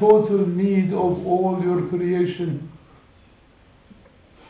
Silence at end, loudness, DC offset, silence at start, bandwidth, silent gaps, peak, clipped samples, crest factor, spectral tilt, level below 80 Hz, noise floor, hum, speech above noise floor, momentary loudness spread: 1.8 s; -21 LUFS; under 0.1%; 0 s; 4 kHz; none; -4 dBFS; under 0.1%; 18 dB; -12.5 dB/octave; -54 dBFS; -53 dBFS; none; 33 dB; 10 LU